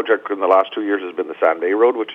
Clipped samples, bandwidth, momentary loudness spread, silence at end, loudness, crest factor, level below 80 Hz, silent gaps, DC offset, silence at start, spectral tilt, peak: under 0.1%; 4 kHz; 6 LU; 0 s; -18 LUFS; 16 dB; -76 dBFS; none; under 0.1%; 0 s; -5.5 dB/octave; -2 dBFS